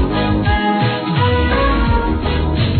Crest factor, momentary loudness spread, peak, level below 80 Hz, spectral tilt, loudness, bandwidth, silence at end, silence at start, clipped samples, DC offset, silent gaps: 12 dB; 3 LU; -4 dBFS; -20 dBFS; -12 dB/octave; -16 LUFS; 4.6 kHz; 0 s; 0 s; under 0.1%; under 0.1%; none